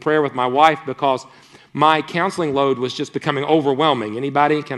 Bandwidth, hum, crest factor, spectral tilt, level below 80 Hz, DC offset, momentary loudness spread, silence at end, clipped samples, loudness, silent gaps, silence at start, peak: 12 kHz; none; 18 dB; -5.5 dB/octave; -64 dBFS; under 0.1%; 7 LU; 0 s; under 0.1%; -18 LUFS; none; 0 s; 0 dBFS